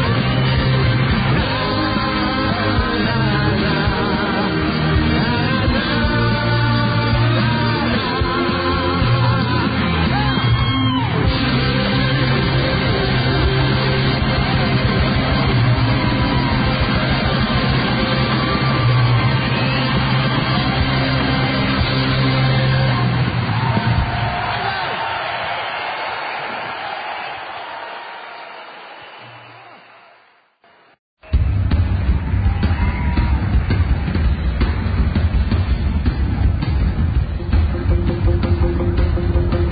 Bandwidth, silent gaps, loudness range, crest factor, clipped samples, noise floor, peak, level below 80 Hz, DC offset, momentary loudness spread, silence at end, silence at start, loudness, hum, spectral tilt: 5 kHz; 30.99-31.17 s; 8 LU; 12 dB; under 0.1%; -53 dBFS; -4 dBFS; -24 dBFS; under 0.1%; 6 LU; 0 s; 0 s; -17 LUFS; none; -11.5 dB/octave